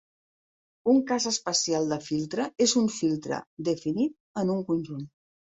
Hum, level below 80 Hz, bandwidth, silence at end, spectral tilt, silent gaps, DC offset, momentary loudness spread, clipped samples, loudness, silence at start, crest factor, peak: none; -68 dBFS; 8.2 kHz; 0.4 s; -4 dB/octave; 3.47-3.57 s, 4.20-4.34 s; under 0.1%; 8 LU; under 0.1%; -27 LUFS; 0.85 s; 16 dB; -12 dBFS